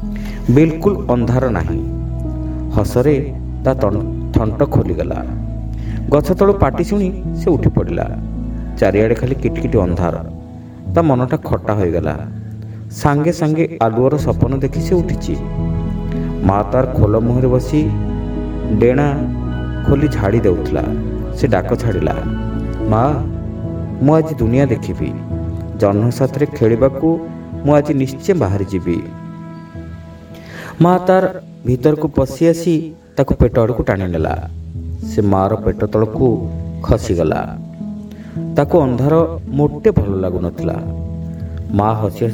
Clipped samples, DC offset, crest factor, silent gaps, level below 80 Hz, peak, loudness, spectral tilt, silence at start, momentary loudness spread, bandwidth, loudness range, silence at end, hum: under 0.1%; under 0.1%; 16 dB; none; -28 dBFS; 0 dBFS; -16 LUFS; -8.5 dB/octave; 0 s; 12 LU; 19 kHz; 2 LU; 0 s; none